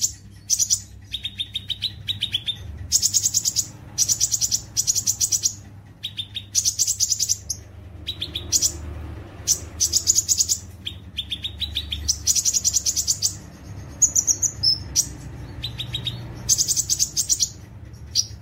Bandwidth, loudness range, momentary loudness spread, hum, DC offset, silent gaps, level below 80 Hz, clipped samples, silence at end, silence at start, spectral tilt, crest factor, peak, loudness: 16.5 kHz; 3 LU; 15 LU; none; under 0.1%; none; -42 dBFS; under 0.1%; 0 s; 0 s; 0 dB/octave; 22 dB; -4 dBFS; -21 LUFS